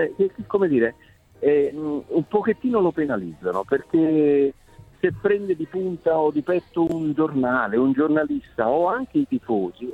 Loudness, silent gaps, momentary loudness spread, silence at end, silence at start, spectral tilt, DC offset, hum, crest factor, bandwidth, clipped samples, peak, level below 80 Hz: -22 LUFS; none; 6 LU; 0 s; 0 s; -9 dB/octave; under 0.1%; none; 16 dB; 8 kHz; under 0.1%; -6 dBFS; -56 dBFS